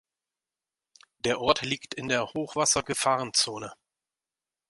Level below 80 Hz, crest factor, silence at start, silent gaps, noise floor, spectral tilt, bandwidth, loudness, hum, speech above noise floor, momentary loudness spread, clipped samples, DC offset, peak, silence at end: -62 dBFS; 24 dB; 1.25 s; none; under -90 dBFS; -2 dB/octave; 11.5 kHz; -27 LUFS; none; over 62 dB; 8 LU; under 0.1%; under 0.1%; -6 dBFS; 0.95 s